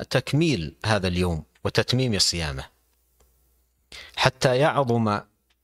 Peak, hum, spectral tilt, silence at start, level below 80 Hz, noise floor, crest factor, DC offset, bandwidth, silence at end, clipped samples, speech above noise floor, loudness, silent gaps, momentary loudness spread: -2 dBFS; none; -4.5 dB/octave; 0 s; -46 dBFS; -66 dBFS; 24 dB; under 0.1%; 14.5 kHz; 0.4 s; under 0.1%; 43 dB; -23 LUFS; none; 11 LU